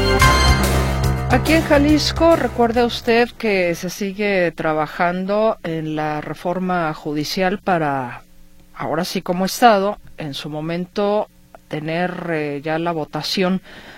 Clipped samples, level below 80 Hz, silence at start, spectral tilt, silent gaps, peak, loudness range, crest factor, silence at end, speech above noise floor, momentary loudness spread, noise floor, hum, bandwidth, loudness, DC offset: under 0.1%; -30 dBFS; 0 s; -5 dB/octave; none; 0 dBFS; 6 LU; 18 dB; 0 s; 25 dB; 11 LU; -43 dBFS; none; 16.5 kHz; -19 LUFS; under 0.1%